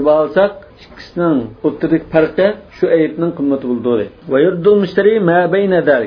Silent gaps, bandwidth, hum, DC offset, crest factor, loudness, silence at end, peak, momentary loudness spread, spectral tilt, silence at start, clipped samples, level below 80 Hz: none; 5.4 kHz; none; under 0.1%; 14 dB; -14 LUFS; 0 s; 0 dBFS; 6 LU; -9 dB/octave; 0 s; under 0.1%; -48 dBFS